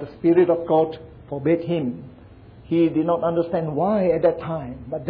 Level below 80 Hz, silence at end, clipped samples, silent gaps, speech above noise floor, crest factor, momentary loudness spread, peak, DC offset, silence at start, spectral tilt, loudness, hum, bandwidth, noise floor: -52 dBFS; 0 s; under 0.1%; none; 24 dB; 16 dB; 12 LU; -6 dBFS; under 0.1%; 0 s; -11.5 dB/octave; -21 LUFS; none; 4.8 kHz; -45 dBFS